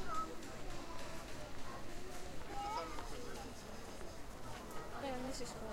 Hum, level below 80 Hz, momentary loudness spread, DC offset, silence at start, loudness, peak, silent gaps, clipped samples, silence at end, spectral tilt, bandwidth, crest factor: none; -54 dBFS; 7 LU; under 0.1%; 0 s; -48 LUFS; -28 dBFS; none; under 0.1%; 0 s; -4 dB/octave; 16 kHz; 16 dB